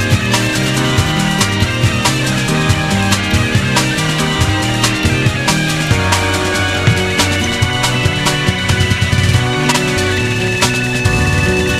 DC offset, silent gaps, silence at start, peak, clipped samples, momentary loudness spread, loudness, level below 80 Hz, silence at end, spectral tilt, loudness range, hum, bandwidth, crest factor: under 0.1%; none; 0 s; 0 dBFS; under 0.1%; 1 LU; -13 LUFS; -28 dBFS; 0 s; -4 dB/octave; 0 LU; none; 15.5 kHz; 14 dB